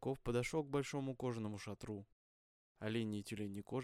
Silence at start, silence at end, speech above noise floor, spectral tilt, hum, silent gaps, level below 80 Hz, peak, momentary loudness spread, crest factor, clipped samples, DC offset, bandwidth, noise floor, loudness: 0 s; 0 s; over 48 dB; -6 dB/octave; none; 2.12-2.75 s; -64 dBFS; -26 dBFS; 9 LU; 18 dB; under 0.1%; under 0.1%; 15.5 kHz; under -90 dBFS; -43 LUFS